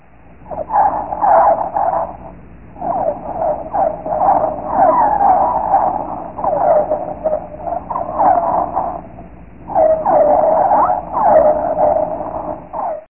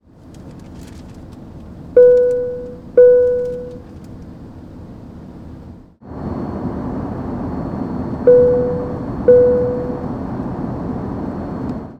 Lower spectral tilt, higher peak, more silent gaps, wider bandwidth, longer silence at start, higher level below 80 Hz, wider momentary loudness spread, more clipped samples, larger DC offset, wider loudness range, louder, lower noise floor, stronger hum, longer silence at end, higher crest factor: first, -11.5 dB/octave vs -9.5 dB/octave; about the same, 0 dBFS vs 0 dBFS; neither; second, 2.9 kHz vs 4.6 kHz; first, 0.4 s vs 0.25 s; about the same, -42 dBFS vs -40 dBFS; second, 13 LU vs 25 LU; neither; first, 0.8% vs under 0.1%; second, 4 LU vs 14 LU; about the same, -15 LUFS vs -16 LUFS; about the same, -41 dBFS vs -38 dBFS; neither; about the same, 0.05 s vs 0.05 s; about the same, 14 dB vs 16 dB